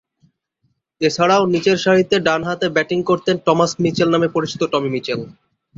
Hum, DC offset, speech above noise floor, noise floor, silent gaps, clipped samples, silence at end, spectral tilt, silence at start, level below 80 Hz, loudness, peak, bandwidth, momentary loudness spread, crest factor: none; under 0.1%; 51 dB; -68 dBFS; none; under 0.1%; 0.45 s; -5 dB/octave; 1 s; -56 dBFS; -17 LUFS; -2 dBFS; 7.8 kHz; 7 LU; 16 dB